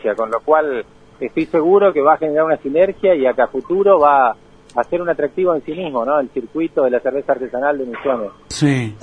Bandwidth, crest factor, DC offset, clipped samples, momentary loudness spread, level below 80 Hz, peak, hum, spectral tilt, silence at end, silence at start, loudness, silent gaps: 10.5 kHz; 16 dB; under 0.1%; under 0.1%; 10 LU; -52 dBFS; 0 dBFS; none; -6.5 dB/octave; 0.05 s; 0.05 s; -17 LUFS; none